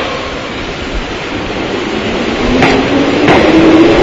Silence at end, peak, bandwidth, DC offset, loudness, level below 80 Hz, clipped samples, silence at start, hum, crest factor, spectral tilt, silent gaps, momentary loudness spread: 0 s; 0 dBFS; 8 kHz; under 0.1%; -11 LUFS; -26 dBFS; 0.6%; 0 s; none; 10 dB; -5.5 dB/octave; none; 13 LU